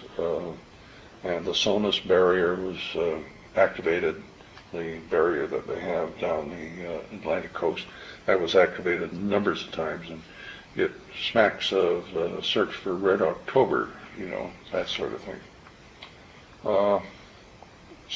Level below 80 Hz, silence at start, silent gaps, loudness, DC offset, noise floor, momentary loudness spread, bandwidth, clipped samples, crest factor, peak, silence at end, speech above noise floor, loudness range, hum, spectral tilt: -56 dBFS; 0 s; none; -27 LUFS; under 0.1%; -50 dBFS; 16 LU; 7.8 kHz; under 0.1%; 20 dB; -6 dBFS; 0 s; 24 dB; 5 LU; none; -5 dB/octave